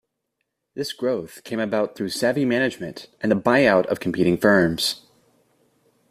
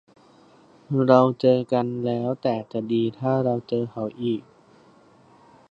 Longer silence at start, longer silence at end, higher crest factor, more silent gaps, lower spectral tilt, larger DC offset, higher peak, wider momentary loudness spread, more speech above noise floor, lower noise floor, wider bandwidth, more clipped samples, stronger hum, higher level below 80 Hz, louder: second, 0.75 s vs 0.9 s; second, 1.15 s vs 1.3 s; about the same, 20 dB vs 22 dB; neither; second, -5 dB/octave vs -9 dB/octave; neither; about the same, -4 dBFS vs -2 dBFS; first, 14 LU vs 11 LU; first, 56 dB vs 32 dB; first, -78 dBFS vs -54 dBFS; first, 15.5 kHz vs 7.2 kHz; neither; neither; first, -58 dBFS vs -66 dBFS; about the same, -21 LUFS vs -23 LUFS